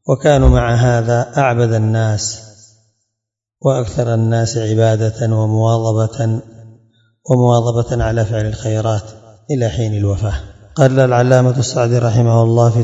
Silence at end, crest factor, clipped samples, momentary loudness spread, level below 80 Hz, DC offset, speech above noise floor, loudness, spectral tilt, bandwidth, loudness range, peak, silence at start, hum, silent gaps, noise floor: 0 s; 14 dB; under 0.1%; 8 LU; -28 dBFS; under 0.1%; 67 dB; -15 LUFS; -6.5 dB/octave; 7.8 kHz; 3 LU; 0 dBFS; 0.05 s; none; none; -80 dBFS